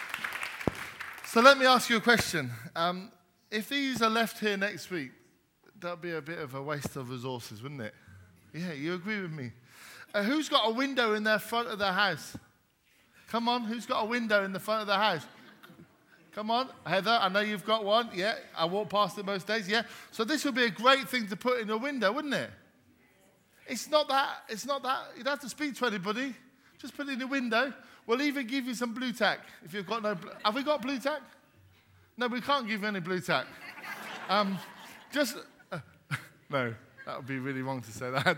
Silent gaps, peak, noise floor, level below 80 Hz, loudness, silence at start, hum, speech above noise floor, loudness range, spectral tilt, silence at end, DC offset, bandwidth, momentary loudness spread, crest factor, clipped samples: none; -4 dBFS; -68 dBFS; -70 dBFS; -30 LUFS; 0 s; none; 37 dB; 7 LU; -4 dB/octave; 0 s; under 0.1%; 18.5 kHz; 15 LU; 28 dB; under 0.1%